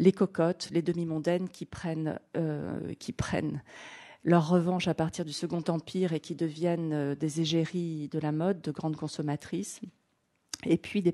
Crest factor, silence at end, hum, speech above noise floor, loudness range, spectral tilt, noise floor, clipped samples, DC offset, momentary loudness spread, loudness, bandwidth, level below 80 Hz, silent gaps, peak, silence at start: 22 dB; 0 s; none; 45 dB; 4 LU; -6.5 dB/octave; -75 dBFS; under 0.1%; under 0.1%; 12 LU; -31 LUFS; 12 kHz; -60 dBFS; none; -10 dBFS; 0 s